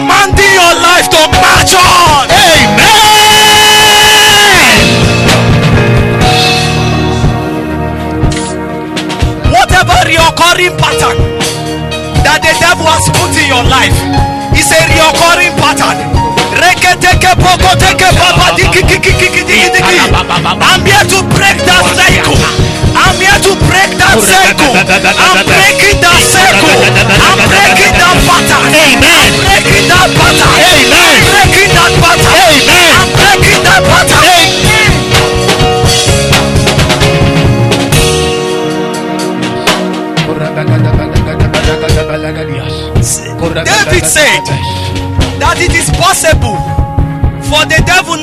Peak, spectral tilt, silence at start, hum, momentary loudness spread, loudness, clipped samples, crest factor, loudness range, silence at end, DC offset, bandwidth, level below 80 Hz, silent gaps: 0 dBFS; -3 dB/octave; 0 s; none; 10 LU; -5 LUFS; 2%; 6 dB; 7 LU; 0 s; under 0.1%; over 20 kHz; -20 dBFS; none